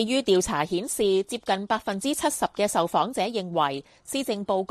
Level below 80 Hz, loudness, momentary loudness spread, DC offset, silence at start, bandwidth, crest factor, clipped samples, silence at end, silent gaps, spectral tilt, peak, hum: -56 dBFS; -26 LUFS; 5 LU; under 0.1%; 0 s; 15 kHz; 16 dB; under 0.1%; 0.05 s; none; -3.5 dB/octave; -8 dBFS; none